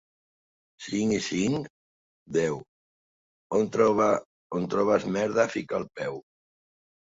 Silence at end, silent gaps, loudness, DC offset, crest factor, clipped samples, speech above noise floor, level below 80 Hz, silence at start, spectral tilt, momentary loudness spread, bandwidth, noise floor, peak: 0.8 s; 1.70-2.26 s, 2.68-3.50 s, 4.26-4.50 s; -27 LUFS; under 0.1%; 20 dB; under 0.1%; over 64 dB; -62 dBFS; 0.8 s; -5.5 dB/octave; 12 LU; 7.8 kHz; under -90 dBFS; -8 dBFS